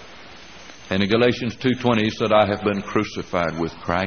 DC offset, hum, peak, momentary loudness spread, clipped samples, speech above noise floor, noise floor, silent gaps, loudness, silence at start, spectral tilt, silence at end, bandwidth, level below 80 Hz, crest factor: 0.3%; none; -2 dBFS; 23 LU; under 0.1%; 22 dB; -43 dBFS; none; -21 LUFS; 0 s; -4.5 dB/octave; 0 s; 6.6 kHz; -50 dBFS; 20 dB